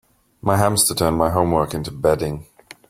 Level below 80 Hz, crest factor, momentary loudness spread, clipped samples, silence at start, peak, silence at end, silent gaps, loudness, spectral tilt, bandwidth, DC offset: -42 dBFS; 18 dB; 10 LU; under 0.1%; 0.45 s; -2 dBFS; 0.45 s; none; -19 LUFS; -4.5 dB/octave; 16.5 kHz; under 0.1%